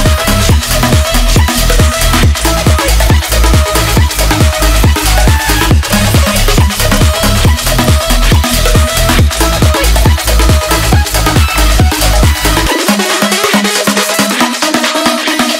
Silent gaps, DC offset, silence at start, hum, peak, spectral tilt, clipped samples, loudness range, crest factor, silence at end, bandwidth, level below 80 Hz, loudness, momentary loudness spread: none; under 0.1%; 0 s; none; 0 dBFS; -4 dB/octave; under 0.1%; 0 LU; 8 dB; 0 s; 16.5 kHz; -12 dBFS; -9 LUFS; 1 LU